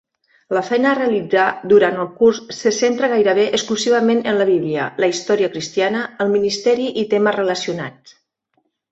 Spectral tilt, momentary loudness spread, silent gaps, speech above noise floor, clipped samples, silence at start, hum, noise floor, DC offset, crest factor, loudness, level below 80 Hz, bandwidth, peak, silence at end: -4 dB/octave; 6 LU; none; 51 dB; under 0.1%; 0.5 s; none; -67 dBFS; under 0.1%; 16 dB; -17 LUFS; -62 dBFS; 8 kHz; -2 dBFS; 1 s